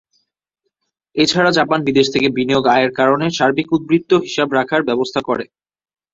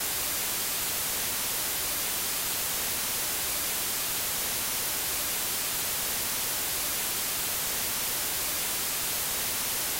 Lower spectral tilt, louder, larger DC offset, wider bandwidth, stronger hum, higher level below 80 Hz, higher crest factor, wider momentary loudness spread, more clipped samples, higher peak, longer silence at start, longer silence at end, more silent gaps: first, -5 dB/octave vs 0 dB/octave; first, -16 LUFS vs -27 LUFS; neither; second, 8 kHz vs 16 kHz; neither; about the same, -56 dBFS vs -54 dBFS; about the same, 16 dB vs 12 dB; first, 6 LU vs 0 LU; neither; first, -2 dBFS vs -18 dBFS; first, 1.15 s vs 0 s; first, 0.7 s vs 0 s; neither